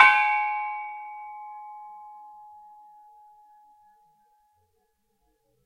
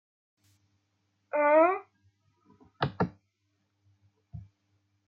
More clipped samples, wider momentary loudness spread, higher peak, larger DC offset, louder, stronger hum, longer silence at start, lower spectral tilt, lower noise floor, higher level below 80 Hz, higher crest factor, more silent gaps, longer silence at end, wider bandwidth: neither; about the same, 26 LU vs 27 LU; first, 0 dBFS vs -12 dBFS; neither; about the same, -25 LUFS vs -27 LUFS; neither; second, 0 s vs 1.35 s; second, 0 dB/octave vs -8.5 dB/octave; second, -73 dBFS vs -77 dBFS; second, -84 dBFS vs -66 dBFS; first, 28 dB vs 22 dB; neither; first, 3.5 s vs 0.65 s; first, 11.5 kHz vs 5.6 kHz